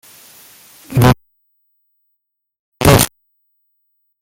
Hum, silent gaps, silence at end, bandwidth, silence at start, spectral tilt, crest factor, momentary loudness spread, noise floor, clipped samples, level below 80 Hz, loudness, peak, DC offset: none; 2.59-2.72 s; 1.15 s; over 20 kHz; 0.9 s; -5 dB/octave; 18 dB; 10 LU; -73 dBFS; under 0.1%; -34 dBFS; -13 LUFS; 0 dBFS; under 0.1%